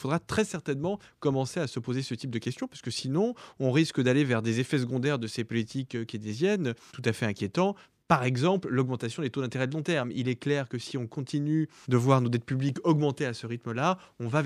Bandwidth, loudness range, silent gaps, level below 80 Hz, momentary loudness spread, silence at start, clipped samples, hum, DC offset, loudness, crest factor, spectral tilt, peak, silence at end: 13 kHz; 3 LU; none; -66 dBFS; 9 LU; 0 s; under 0.1%; none; under 0.1%; -29 LUFS; 22 dB; -6.5 dB/octave; -6 dBFS; 0 s